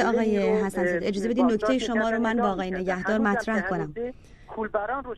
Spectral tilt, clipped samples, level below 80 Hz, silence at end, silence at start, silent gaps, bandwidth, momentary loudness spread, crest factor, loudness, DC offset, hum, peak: -6 dB/octave; under 0.1%; -50 dBFS; 0 s; 0 s; none; 12.5 kHz; 8 LU; 16 dB; -25 LUFS; under 0.1%; none; -10 dBFS